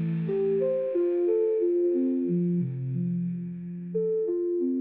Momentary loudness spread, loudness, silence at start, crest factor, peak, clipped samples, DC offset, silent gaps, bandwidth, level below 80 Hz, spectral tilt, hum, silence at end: 7 LU; -27 LUFS; 0 s; 10 dB; -16 dBFS; under 0.1%; under 0.1%; none; 3.7 kHz; -74 dBFS; -12 dB/octave; none; 0 s